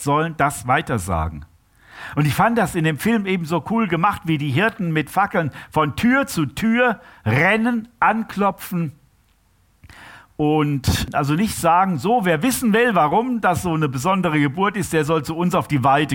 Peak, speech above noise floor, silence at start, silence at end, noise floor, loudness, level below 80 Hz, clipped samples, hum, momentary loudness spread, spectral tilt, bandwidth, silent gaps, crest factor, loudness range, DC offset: -4 dBFS; 40 dB; 0 s; 0 s; -59 dBFS; -19 LUFS; -42 dBFS; under 0.1%; none; 7 LU; -5.5 dB/octave; 17 kHz; none; 16 dB; 4 LU; under 0.1%